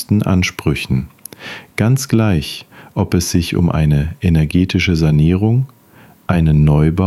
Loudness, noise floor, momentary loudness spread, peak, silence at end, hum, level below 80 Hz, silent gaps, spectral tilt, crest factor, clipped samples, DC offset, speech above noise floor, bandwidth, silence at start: -15 LUFS; -45 dBFS; 14 LU; 0 dBFS; 0 s; none; -28 dBFS; none; -6.5 dB/octave; 14 dB; under 0.1%; under 0.1%; 31 dB; 13.5 kHz; 0 s